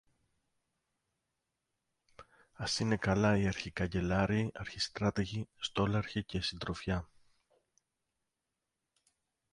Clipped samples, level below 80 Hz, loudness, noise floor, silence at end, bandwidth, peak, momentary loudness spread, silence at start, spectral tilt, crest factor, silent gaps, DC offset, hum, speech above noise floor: under 0.1%; -54 dBFS; -34 LUFS; -88 dBFS; 2.5 s; 11.5 kHz; -18 dBFS; 9 LU; 2.2 s; -5.5 dB/octave; 20 dB; none; under 0.1%; none; 54 dB